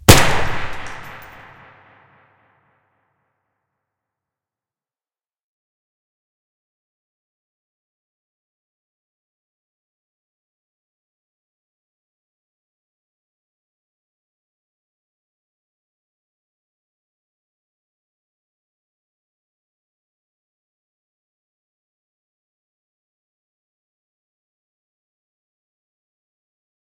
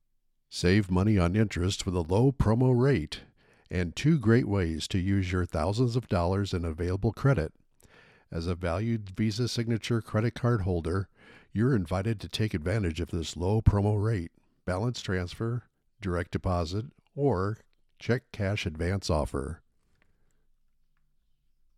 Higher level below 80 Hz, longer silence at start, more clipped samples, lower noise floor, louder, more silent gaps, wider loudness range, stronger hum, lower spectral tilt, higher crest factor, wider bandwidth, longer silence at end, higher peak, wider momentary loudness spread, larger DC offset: first, -38 dBFS vs -44 dBFS; second, 0.1 s vs 0.5 s; neither; first, under -90 dBFS vs -71 dBFS; first, -17 LUFS vs -29 LUFS; neither; first, 27 LU vs 6 LU; neither; second, -3.5 dB/octave vs -6.5 dB/octave; first, 28 dB vs 22 dB; first, 15.5 kHz vs 13 kHz; first, 25.65 s vs 2.2 s; first, 0 dBFS vs -6 dBFS; first, 28 LU vs 11 LU; neither